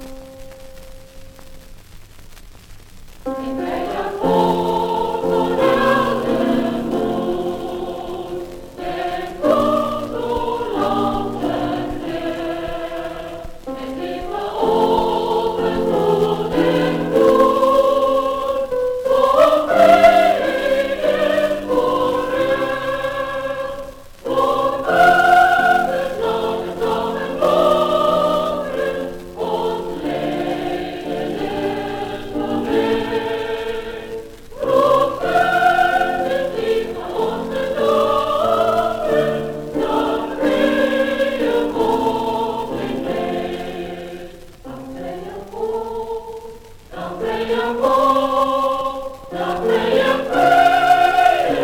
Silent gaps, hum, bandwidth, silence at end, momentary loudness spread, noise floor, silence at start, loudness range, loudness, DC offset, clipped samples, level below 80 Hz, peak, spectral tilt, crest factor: none; none; 19 kHz; 0 s; 15 LU; -39 dBFS; 0 s; 9 LU; -18 LUFS; under 0.1%; under 0.1%; -42 dBFS; -2 dBFS; -5.5 dB/octave; 16 dB